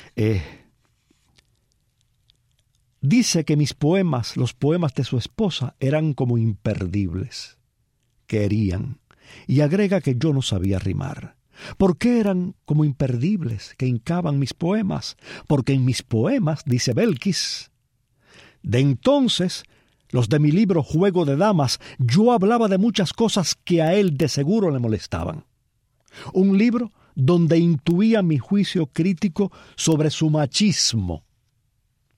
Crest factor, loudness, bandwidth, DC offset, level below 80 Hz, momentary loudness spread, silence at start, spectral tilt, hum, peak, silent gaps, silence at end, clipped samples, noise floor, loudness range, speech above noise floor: 16 dB; -21 LUFS; 14.5 kHz; under 0.1%; -50 dBFS; 11 LU; 0.15 s; -6 dB/octave; none; -6 dBFS; none; 1 s; under 0.1%; -68 dBFS; 5 LU; 48 dB